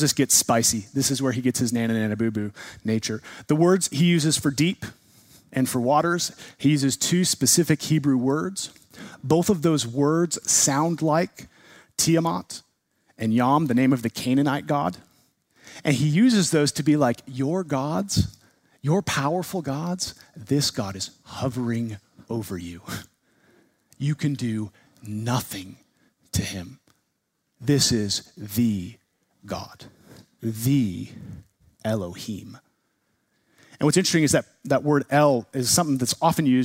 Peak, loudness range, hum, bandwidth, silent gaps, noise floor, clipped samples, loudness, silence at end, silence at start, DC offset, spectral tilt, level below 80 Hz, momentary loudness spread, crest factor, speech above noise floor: -4 dBFS; 8 LU; none; 16 kHz; none; -75 dBFS; under 0.1%; -23 LUFS; 0 s; 0 s; under 0.1%; -4.5 dB/octave; -54 dBFS; 15 LU; 20 dB; 52 dB